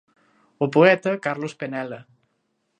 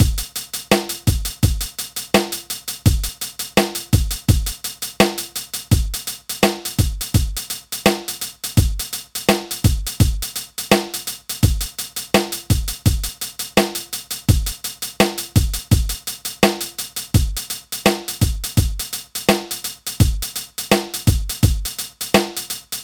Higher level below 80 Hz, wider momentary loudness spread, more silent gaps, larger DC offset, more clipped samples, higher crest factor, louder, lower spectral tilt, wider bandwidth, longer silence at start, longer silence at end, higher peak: second, -74 dBFS vs -26 dBFS; first, 16 LU vs 8 LU; neither; neither; neither; about the same, 22 dB vs 20 dB; about the same, -21 LUFS vs -20 LUFS; first, -6.5 dB/octave vs -4.5 dB/octave; second, 9.2 kHz vs over 20 kHz; first, 0.6 s vs 0 s; first, 0.75 s vs 0 s; about the same, -2 dBFS vs 0 dBFS